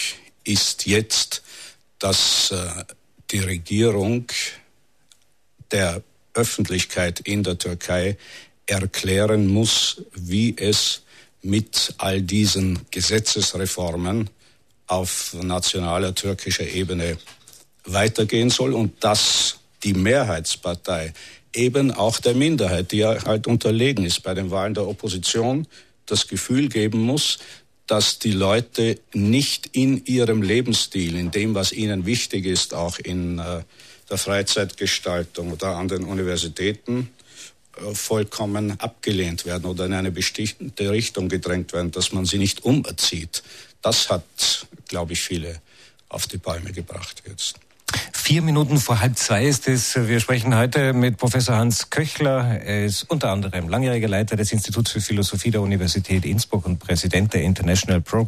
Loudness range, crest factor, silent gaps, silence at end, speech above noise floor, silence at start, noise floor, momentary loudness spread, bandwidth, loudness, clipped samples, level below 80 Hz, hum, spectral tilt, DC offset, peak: 5 LU; 14 dB; none; 0 s; 41 dB; 0 s; -62 dBFS; 10 LU; 14 kHz; -21 LUFS; under 0.1%; -46 dBFS; none; -4 dB/octave; 0.1%; -8 dBFS